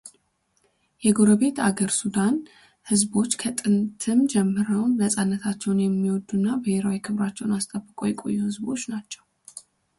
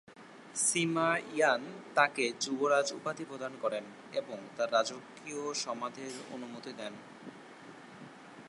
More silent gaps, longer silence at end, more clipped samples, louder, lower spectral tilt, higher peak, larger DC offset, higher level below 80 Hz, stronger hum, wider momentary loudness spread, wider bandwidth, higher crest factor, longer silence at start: neither; first, 0.4 s vs 0 s; neither; first, -24 LUFS vs -33 LUFS; first, -5 dB/octave vs -2.5 dB/octave; first, -6 dBFS vs -12 dBFS; neither; first, -62 dBFS vs -84 dBFS; neither; second, 10 LU vs 22 LU; about the same, 11.5 kHz vs 11.5 kHz; second, 18 dB vs 24 dB; about the same, 0.05 s vs 0.1 s